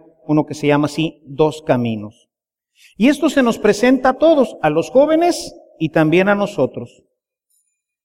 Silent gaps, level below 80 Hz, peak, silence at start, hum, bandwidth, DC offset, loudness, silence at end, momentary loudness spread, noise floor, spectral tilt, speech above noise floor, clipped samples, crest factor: none; -50 dBFS; -2 dBFS; 0.3 s; none; 16 kHz; under 0.1%; -16 LUFS; 1.2 s; 11 LU; -71 dBFS; -6 dB/octave; 56 dB; under 0.1%; 16 dB